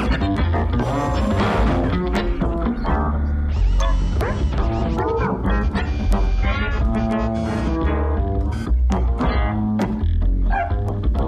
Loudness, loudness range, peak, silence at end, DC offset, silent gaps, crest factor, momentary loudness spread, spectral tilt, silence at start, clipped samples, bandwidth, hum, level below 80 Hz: -21 LUFS; 1 LU; -8 dBFS; 0 s; under 0.1%; none; 12 dB; 3 LU; -7.5 dB/octave; 0 s; under 0.1%; 8.4 kHz; none; -22 dBFS